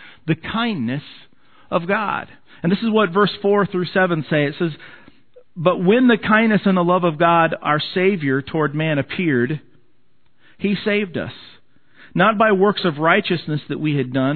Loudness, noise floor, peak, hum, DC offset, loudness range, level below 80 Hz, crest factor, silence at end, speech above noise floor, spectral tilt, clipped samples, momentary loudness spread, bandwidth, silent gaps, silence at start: -18 LUFS; -64 dBFS; 0 dBFS; none; 0.4%; 6 LU; -58 dBFS; 18 dB; 0 s; 46 dB; -10 dB/octave; under 0.1%; 10 LU; 4.6 kHz; none; 0 s